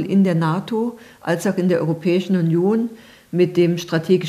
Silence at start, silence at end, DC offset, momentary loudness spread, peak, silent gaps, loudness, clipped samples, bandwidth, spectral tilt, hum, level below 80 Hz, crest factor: 0 s; 0 s; under 0.1%; 8 LU; -4 dBFS; none; -19 LUFS; under 0.1%; 14.5 kHz; -7 dB/octave; none; -64 dBFS; 14 dB